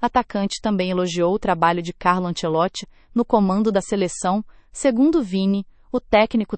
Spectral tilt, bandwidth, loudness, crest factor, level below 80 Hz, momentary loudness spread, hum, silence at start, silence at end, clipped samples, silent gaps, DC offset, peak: -5.5 dB/octave; 8.8 kHz; -21 LUFS; 18 dB; -46 dBFS; 8 LU; none; 0 s; 0 s; under 0.1%; none; under 0.1%; -2 dBFS